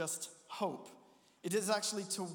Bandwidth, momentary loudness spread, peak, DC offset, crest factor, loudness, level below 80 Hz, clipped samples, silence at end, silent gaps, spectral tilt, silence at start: 19.5 kHz; 14 LU; -20 dBFS; under 0.1%; 20 dB; -38 LUFS; under -90 dBFS; under 0.1%; 0 s; none; -3 dB/octave; 0 s